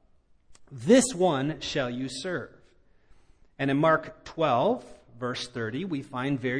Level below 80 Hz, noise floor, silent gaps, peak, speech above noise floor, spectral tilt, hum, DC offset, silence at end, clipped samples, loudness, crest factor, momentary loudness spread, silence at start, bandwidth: -60 dBFS; -61 dBFS; none; -8 dBFS; 34 dB; -5 dB/octave; none; under 0.1%; 0 s; under 0.1%; -27 LUFS; 22 dB; 14 LU; 0.5 s; 10.5 kHz